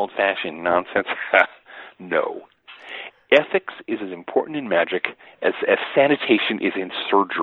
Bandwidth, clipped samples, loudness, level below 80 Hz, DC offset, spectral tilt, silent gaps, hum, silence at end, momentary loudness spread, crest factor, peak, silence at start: 7 kHz; under 0.1%; -21 LUFS; -66 dBFS; under 0.1%; -6 dB/octave; none; none; 0 s; 17 LU; 20 dB; 0 dBFS; 0 s